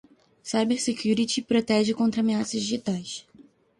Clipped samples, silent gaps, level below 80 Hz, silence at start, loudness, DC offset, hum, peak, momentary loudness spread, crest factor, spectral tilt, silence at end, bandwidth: under 0.1%; none; -64 dBFS; 0.45 s; -25 LUFS; under 0.1%; none; -10 dBFS; 10 LU; 16 dB; -4.5 dB/octave; 0.4 s; 11.5 kHz